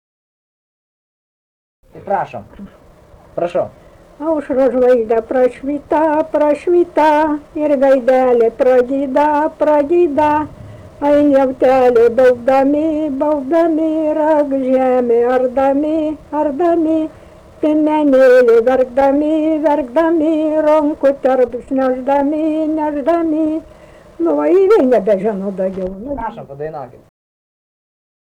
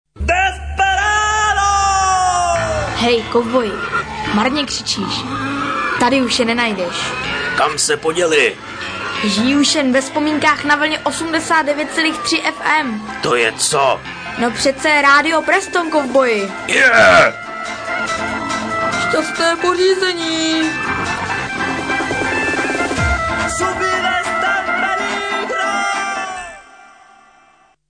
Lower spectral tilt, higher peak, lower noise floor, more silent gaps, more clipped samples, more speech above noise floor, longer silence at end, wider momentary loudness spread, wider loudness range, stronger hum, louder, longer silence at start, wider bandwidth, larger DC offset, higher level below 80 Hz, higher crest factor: first, -7 dB/octave vs -3 dB/octave; about the same, -4 dBFS vs -2 dBFS; second, -43 dBFS vs -52 dBFS; neither; neither; second, 30 dB vs 37 dB; first, 1.5 s vs 1.15 s; first, 10 LU vs 7 LU; about the same, 6 LU vs 4 LU; neither; about the same, -14 LUFS vs -15 LUFS; first, 1.95 s vs 0.15 s; about the same, 9.8 kHz vs 10.5 kHz; neither; second, -46 dBFS vs -36 dBFS; about the same, 10 dB vs 14 dB